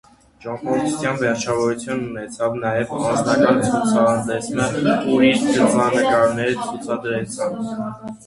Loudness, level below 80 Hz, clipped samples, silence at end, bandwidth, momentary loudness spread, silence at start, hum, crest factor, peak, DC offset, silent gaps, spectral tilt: -19 LUFS; -54 dBFS; under 0.1%; 0.1 s; 11.5 kHz; 10 LU; 0.4 s; none; 18 dB; -2 dBFS; under 0.1%; none; -5 dB/octave